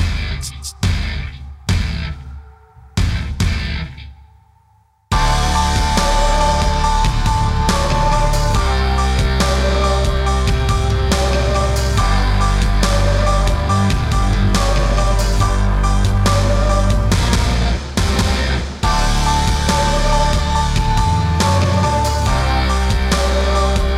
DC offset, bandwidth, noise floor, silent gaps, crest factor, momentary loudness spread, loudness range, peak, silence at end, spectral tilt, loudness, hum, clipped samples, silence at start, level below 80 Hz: under 0.1%; 14.5 kHz; -55 dBFS; none; 14 dB; 6 LU; 6 LU; 0 dBFS; 0 s; -5 dB/octave; -17 LUFS; none; under 0.1%; 0 s; -18 dBFS